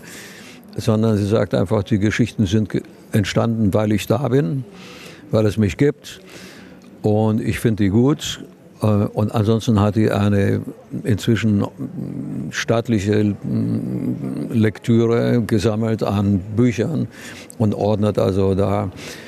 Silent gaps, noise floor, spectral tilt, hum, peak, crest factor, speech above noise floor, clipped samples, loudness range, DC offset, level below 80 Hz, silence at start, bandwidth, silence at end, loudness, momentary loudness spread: none; -41 dBFS; -7 dB/octave; none; -2 dBFS; 16 dB; 23 dB; under 0.1%; 3 LU; under 0.1%; -48 dBFS; 0 s; 14 kHz; 0 s; -19 LUFS; 13 LU